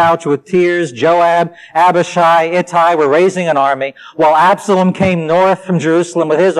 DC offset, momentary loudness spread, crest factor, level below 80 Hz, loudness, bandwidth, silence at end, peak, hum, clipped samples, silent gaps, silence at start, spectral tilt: under 0.1%; 5 LU; 8 dB; -50 dBFS; -12 LUFS; 13 kHz; 0 s; -2 dBFS; none; under 0.1%; none; 0 s; -6 dB/octave